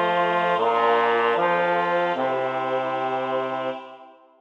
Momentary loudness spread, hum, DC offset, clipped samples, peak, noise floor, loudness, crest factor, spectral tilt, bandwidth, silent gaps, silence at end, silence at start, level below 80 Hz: 7 LU; none; under 0.1%; under 0.1%; -8 dBFS; -47 dBFS; -22 LUFS; 14 dB; -6 dB/octave; 8.2 kHz; none; 0.3 s; 0 s; -78 dBFS